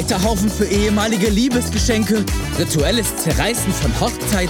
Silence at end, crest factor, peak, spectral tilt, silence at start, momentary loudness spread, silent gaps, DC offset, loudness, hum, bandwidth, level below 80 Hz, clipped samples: 0 s; 12 dB; -4 dBFS; -4.5 dB/octave; 0 s; 3 LU; none; under 0.1%; -17 LUFS; none; 18 kHz; -26 dBFS; under 0.1%